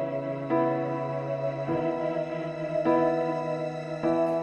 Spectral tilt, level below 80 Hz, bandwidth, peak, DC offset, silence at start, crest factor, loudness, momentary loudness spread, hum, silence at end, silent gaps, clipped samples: -8.5 dB/octave; -64 dBFS; 8.4 kHz; -12 dBFS; under 0.1%; 0 s; 16 dB; -28 LUFS; 8 LU; none; 0 s; none; under 0.1%